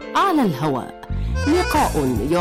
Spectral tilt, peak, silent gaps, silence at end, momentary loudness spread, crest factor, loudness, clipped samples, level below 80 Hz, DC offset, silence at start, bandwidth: -5.5 dB/octave; -10 dBFS; none; 0 s; 10 LU; 8 dB; -20 LUFS; under 0.1%; -30 dBFS; under 0.1%; 0 s; 16 kHz